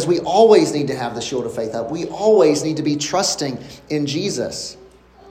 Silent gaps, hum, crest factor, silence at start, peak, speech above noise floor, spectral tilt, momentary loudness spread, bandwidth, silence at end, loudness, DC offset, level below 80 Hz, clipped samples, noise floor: none; none; 18 dB; 0 s; 0 dBFS; 28 dB; -4.5 dB/octave; 13 LU; 15 kHz; 0 s; -18 LUFS; under 0.1%; -54 dBFS; under 0.1%; -45 dBFS